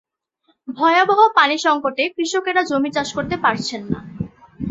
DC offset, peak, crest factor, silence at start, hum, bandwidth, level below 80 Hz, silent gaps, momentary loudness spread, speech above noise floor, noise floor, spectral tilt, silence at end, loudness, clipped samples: under 0.1%; -2 dBFS; 18 dB; 0.65 s; none; 8 kHz; -50 dBFS; none; 18 LU; 47 dB; -64 dBFS; -4 dB/octave; 0 s; -18 LUFS; under 0.1%